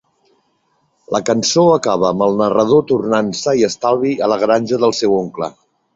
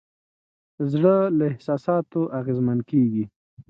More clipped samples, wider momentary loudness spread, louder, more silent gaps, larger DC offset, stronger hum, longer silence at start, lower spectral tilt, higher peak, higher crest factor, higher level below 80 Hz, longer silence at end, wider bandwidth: neither; about the same, 7 LU vs 9 LU; first, -15 LUFS vs -23 LUFS; second, none vs 3.36-3.57 s; neither; neither; first, 1.1 s vs 0.8 s; second, -5 dB/octave vs -10.5 dB/octave; first, 0 dBFS vs -6 dBFS; about the same, 14 dB vs 16 dB; first, -56 dBFS vs -64 dBFS; first, 0.45 s vs 0.1 s; first, 8 kHz vs 7 kHz